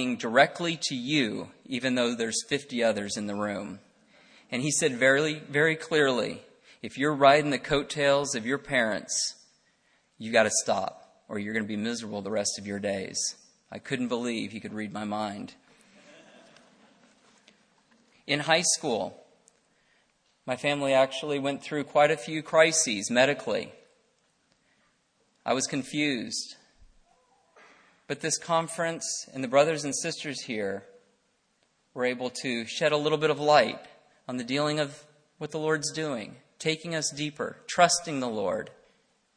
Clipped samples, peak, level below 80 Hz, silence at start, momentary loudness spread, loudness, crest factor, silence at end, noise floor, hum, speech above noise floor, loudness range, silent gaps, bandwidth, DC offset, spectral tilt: under 0.1%; -4 dBFS; -68 dBFS; 0 s; 14 LU; -27 LUFS; 24 dB; 0.65 s; -71 dBFS; none; 44 dB; 8 LU; none; 10.5 kHz; under 0.1%; -3 dB/octave